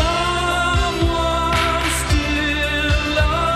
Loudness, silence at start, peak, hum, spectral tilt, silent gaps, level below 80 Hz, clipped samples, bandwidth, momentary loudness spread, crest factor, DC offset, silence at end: -18 LUFS; 0 s; -4 dBFS; none; -4 dB/octave; none; -24 dBFS; under 0.1%; 15.5 kHz; 1 LU; 14 dB; under 0.1%; 0 s